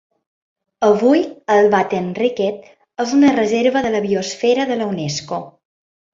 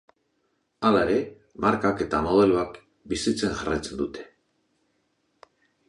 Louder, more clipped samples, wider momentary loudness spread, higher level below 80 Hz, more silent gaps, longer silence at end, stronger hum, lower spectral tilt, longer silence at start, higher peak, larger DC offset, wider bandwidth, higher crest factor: first, -17 LUFS vs -25 LUFS; neither; about the same, 11 LU vs 12 LU; second, -58 dBFS vs -50 dBFS; neither; second, 0.65 s vs 1.65 s; neither; about the same, -5 dB/octave vs -5.5 dB/octave; about the same, 0.8 s vs 0.8 s; first, -2 dBFS vs -6 dBFS; neither; second, 7.8 kHz vs 11.5 kHz; about the same, 16 dB vs 20 dB